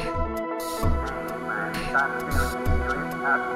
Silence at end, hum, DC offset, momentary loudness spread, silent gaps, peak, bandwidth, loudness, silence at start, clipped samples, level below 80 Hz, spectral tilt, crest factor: 0 s; none; under 0.1%; 6 LU; none; -10 dBFS; 16 kHz; -27 LUFS; 0 s; under 0.1%; -32 dBFS; -5.5 dB/octave; 16 dB